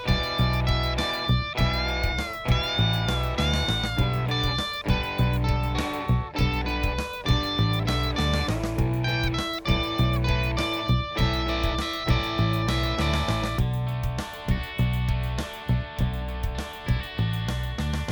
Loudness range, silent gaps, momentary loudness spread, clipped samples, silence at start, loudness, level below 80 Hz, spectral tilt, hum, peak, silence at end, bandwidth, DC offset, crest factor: 3 LU; none; 5 LU; under 0.1%; 0 s; -26 LUFS; -30 dBFS; -5.5 dB/octave; none; -8 dBFS; 0 s; over 20 kHz; under 0.1%; 16 dB